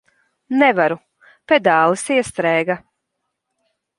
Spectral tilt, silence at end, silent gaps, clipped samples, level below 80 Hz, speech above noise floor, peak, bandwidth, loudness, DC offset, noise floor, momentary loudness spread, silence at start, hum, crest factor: -4.5 dB/octave; 1.2 s; none; under 0.1%; -60 dBFS; 60 dB; 0 dBFS; 11.5 kHz; -17 LUFS; under 0.1%; -76 dBFS; 9 LU; 0.5 s; none; 18 dB